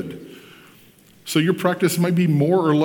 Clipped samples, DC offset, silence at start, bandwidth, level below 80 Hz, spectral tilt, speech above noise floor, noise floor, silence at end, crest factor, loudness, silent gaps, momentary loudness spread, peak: under 0.1%; under 0.1%; 0 s; 19 kHz; -66 dBFS; -6 dB/octave; 33 dB; -51 dBFS; 0 s; 16 dB; -19 LUFS; none; 18 LU; -4 dBFS